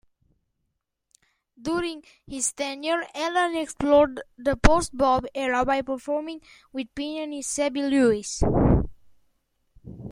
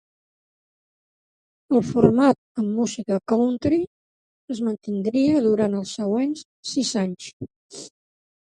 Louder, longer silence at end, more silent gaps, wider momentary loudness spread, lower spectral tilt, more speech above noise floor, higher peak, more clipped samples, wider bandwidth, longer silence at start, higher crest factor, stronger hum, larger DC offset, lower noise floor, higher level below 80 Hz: about the same, -24 LUFS vs -22 LUFS; second, 0 s vs 0.6 s; second, none vs 2.38-2.55 s, 3.87-4.48 s, 6.45-6.63 s, 7.33-7.40 s, 7.56-7.69 s; about the same, 15 LU vs 17 LU; about the same, -5 dB/octave vs -6 dB/octave; second, 55 dB vs over 69 dB; about the same, -2 dBFS vs 0 dBFS; neither; first, 16 kHz vs 11.5 kHz; about the same, 1.6 s vs 1.7 s; about the same, 24 dB vs 22 dB; neither; neither; second, -79 dBFS vs under -90 dBFS; first, -36 dBFS vs -56 dBFS